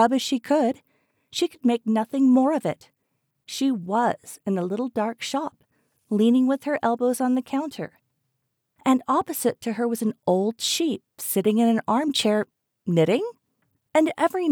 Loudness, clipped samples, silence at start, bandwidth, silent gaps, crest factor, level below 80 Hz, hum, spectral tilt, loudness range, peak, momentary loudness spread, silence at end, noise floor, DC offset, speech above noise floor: -23 LUFS; under 0.1%; 0 s; 19.5 kHz; none; 18 dB; -74 dBFS; none; -5 dB/octave; 3 LU; -6 dBFS; 11 LU; 0 s; -77 dBFS; under 0.1%; 54 dB